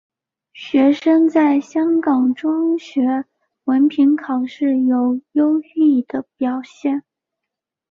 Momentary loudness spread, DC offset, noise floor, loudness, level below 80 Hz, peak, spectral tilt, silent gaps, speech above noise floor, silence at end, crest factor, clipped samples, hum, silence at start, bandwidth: 9 LU; under 0.1%; -83 dBFS; -17 LUFS; -66 dBFS; -4 dBFS; -6 dB/octave; none; 67 dB; 0.9 s; 14 dB; under 0.1%; none; 0.55 s; 7.2 kHz